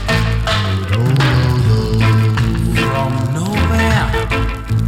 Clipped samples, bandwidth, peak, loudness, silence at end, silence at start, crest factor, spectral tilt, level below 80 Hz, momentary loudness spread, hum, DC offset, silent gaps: under 0.1%; 15.5 kHz; -2 dBFS; -15 LUFS; 0 s; 0 s; 12 dB; -6 dB/octave; -24 dBFS; 5 LU; none; under 0.1%; none